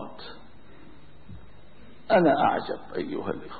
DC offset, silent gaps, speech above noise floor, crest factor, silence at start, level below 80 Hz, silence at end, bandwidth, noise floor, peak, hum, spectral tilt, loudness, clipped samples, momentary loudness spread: 0.8%; none; 27 dB; 18 dB; 0 s; -58 dBFS; 0 s; 4.8 kHz; -52 dBFS; -10 dBFS; none; -10 dB/octave; -25 LUFS; under 0.1%; 21 LU